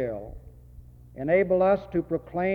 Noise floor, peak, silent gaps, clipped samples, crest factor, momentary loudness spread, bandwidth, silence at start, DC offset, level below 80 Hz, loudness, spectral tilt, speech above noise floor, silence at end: -48 dBFS; -10 dBFS; none; under 0.1%; 16 dB; 15 LU; 4.8 kHz; 0 s; under 0.1%; -48 dBFS; -25 LUFS; -9.5 dB/octave; 23 dB; 0 s